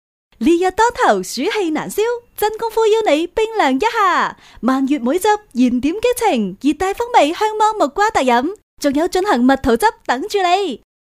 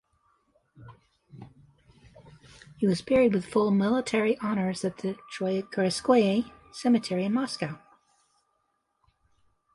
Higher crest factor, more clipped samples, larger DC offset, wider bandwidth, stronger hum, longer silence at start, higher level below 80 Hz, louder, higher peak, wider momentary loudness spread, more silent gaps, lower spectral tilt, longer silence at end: about the same, 16 dB vs 18 dB; neither; neither; first, 15.5 kHz vs 11.5 kHz; neither; second, 0.4 s vs 0.8 s; first, -44 dBFS vs -62 dBFS; first, -16 LUFS vs -27 LUFS; first, 0 dBFS vs -10 dBFS; second, 6 LU vs 11 LU; first, 8.63-8.77 s vs none; second, -4 dB/octave vs -6 dB/octave; second, 0.4 s vs 2 s